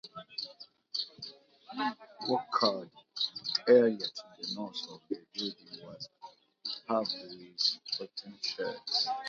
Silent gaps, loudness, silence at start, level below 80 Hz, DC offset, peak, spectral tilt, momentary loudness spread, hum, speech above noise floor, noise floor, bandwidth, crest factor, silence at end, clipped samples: none; -33 LUFS; 0.05 s; -84 dBFS; under 0.1%; -12 dBFS; -1.5 dB/octave; 17 LU; none; 23 dB; -55 dBFS; 7.4 kHz; 22 dB; 0 s; under 0.1%